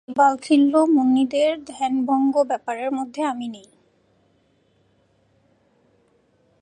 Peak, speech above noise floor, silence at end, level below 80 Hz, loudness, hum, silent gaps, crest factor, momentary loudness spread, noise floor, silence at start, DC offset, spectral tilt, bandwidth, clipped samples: -4 dBFS; 43 dB; 3.05 s; -70 dBFS; -20 LUFS; none; none; 18 dB; 10 LU; -63 dBFS; 0.1 s; under 0.1%; -4.5 dB/octave; 10 kHz; under 0.1%